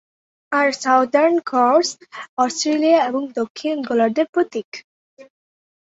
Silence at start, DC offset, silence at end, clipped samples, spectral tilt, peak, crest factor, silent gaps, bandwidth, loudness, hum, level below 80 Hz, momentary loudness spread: 0.5 s; under 0.1%; 0.6 s; under 0.1%; -3 dB/octave; -2 dBFS; 16 dB; 2.29-2.37 s, 3.50-3.55 s, 4.29-4.33 s, 4.64-4.72 s, 4.84-5.17 s; 8 kHz; -18 LUFS; none; -70 dBFS; 12 LU